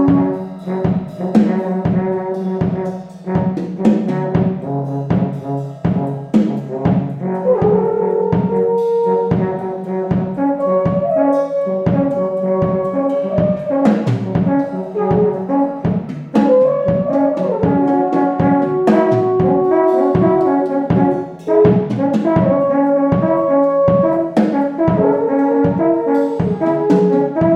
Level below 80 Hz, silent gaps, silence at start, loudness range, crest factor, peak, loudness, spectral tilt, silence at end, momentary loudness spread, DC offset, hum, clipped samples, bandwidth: -46 dBFS; none; 0 s; 4 LU; 14 dB; 0 dBFS; -16 LUFS; -10 dB/octave; 0 s; 7 LU; under 0.1%; none; under 0.1%; 8 kHz